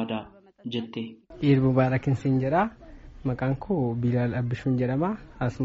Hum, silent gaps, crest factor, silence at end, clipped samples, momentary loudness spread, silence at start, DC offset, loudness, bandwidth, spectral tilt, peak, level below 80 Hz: none; none; 16 dB; 0 s; under 0.1%; 12 LU; 0 s; under 0.1%; -26 LUFS; 7.4 kHz; -7.5 dB/octave; -10 dBFS; -50 dBFS